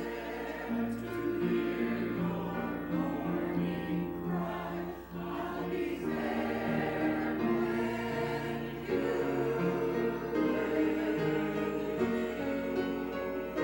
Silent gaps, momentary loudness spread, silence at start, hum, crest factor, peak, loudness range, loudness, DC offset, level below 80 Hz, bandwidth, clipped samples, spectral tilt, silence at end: none; 6 LU; 0 s; none; 14 dB; -18 dBFS; 3 LU; -33 LUFS; under 0.1%; -56 dBFS; 16.5 kHz; under 0.1%; -7.5 dB/octave; 0 s